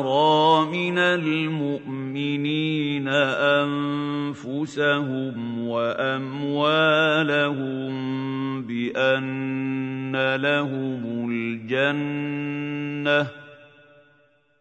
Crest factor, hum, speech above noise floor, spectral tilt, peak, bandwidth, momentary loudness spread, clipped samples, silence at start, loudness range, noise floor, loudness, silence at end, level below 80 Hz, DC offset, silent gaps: 18 dB; none; 38 dB; -6.5 dB/octave; -6 dBFS; 8.6 kHz; 9 LU; under 0.1%; 0 s; 3 LU; -61 dBFS; -23 LUFS; 0.95 s; -72 dBFS; under 0.1%; none